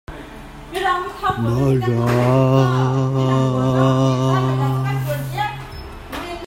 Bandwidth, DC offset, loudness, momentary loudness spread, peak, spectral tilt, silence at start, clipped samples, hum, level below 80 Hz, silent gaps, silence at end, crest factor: 16 kHz; under 0.1%; -18 LUFS; 17 LU; -2 dBFS; -7.5 dB/octave; 0.1 s; under 0.1%; none; -40 dBFS; none; 0 s; 16 dB